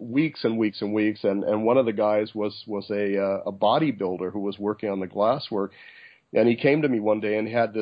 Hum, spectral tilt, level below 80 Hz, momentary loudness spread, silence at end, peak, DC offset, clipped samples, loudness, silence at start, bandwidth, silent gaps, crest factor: none; -10 dB/octave; -66 dBFS; 8 LU; 0 s; -8 dBFS; under 0.1%; under 0.1%; -25 LUFS; 0 s; 5.2 kHz; none; 18 dB